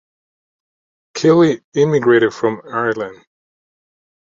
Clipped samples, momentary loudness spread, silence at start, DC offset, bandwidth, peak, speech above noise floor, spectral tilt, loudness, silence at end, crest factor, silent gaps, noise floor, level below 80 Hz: under 0.1%; 12 LU; 1.15 s; under 0.1%; 7.6 kHz; -2 dBFS; over 75 dB; -6.5 dB/octave; -15 LUFS; 1.1 s; 16 dB; 1.64-1.72 s; under -90 dBFS; -60 dBFS